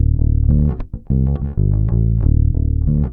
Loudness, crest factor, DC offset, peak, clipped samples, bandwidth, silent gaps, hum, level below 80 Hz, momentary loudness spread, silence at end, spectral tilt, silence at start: -17 LUFS; 12 dB; under 0.1%; -2 dBFS; under 0.1%; 1.8 kHz; none; none; -18 dBFS; 4 LU; 0 s; -14.5 dB/octave; 0 s